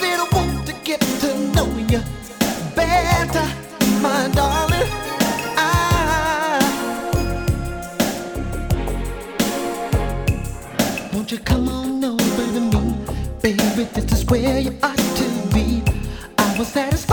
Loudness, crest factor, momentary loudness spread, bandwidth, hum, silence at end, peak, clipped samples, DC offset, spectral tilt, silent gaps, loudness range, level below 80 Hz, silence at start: -20 LUFS; 18 dB; 7 LU; over 20 kHz; none; 0 s; -2 dBFS; under 0.1%; under 0.1%; -5 dB/octave; none; 4 LU; -30 dBFS; 0 s